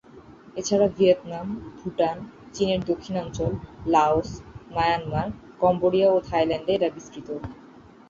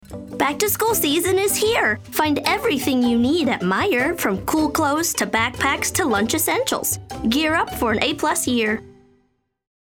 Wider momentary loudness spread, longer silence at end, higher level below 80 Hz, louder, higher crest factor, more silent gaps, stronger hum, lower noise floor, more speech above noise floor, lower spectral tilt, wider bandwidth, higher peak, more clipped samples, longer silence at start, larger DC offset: first, 15 LU vs 4 LU; second, 0.55 s vs 0.95 s; about the same, -48 dBFS vs -46 dBFS; second, -24 LUFS vs -19 LUFS; about the same, 18 dB vs 18 dB; neither; neither; second, -48 dBFS vs -66 dBFS; second, 25 dB vs 46 dB; first, -5.5 dB/octave vs -3 dB/octave; second, 7.6 kHz vs over 20 kHz; second, -8 dBFS vs -4 dBFS; neither; about the same, 0.15 s vs 0.1 s; neither